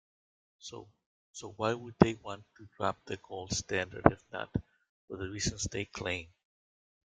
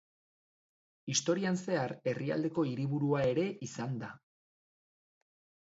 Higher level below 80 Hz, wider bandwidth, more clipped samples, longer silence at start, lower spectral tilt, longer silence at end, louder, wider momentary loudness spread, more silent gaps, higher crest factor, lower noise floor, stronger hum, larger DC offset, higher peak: first, -56 dBFS vs -72 dBFS; first, 9.6 kHz vs 8 kHz; neither; second, 0.65 s vs 1.05 s; about the same, -4.5 dB/octave vs -5 dB/octave; second, 0.8 s vs 1.5 s; about the same, -34 LUFS vs -34 LUFS; first, 19 LU vs 9 LU; first, 1.06-1.34 s, 4.89-5.08 s vs none; first, 34 dB vs 18 dB; about the same, under -90 dBFS vs under -90 dBFS; neither; neither; first, -2 dBFS vs -16 dBFS